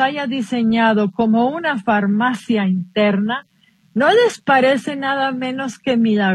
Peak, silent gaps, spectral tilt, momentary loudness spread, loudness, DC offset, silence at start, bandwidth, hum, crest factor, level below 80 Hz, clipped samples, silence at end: -2 dBFS; none; -6 dB/octave; 8 LU; -17 LUFS; under 0.1%; 0 s; 11 kHz; none; 16 dB; -60 dBFS; under 0.1%; 0 s